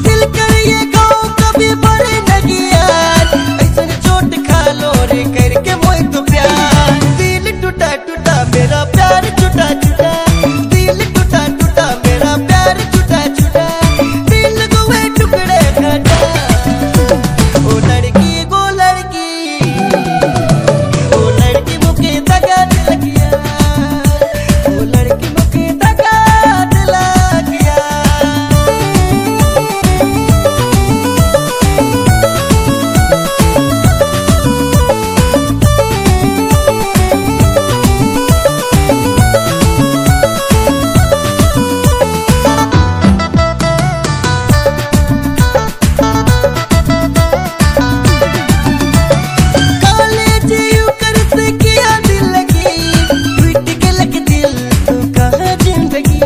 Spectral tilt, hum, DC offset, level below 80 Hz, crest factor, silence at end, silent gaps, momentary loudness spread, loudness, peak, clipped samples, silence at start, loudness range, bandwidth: -5 dB/octave; none; under 0.1%; -18 dBFS; 10 dB; 0 s; none; 3 LU; -10 LUFS; 0 dBFS; 2%; 0 s; 2 LU; 16 kHz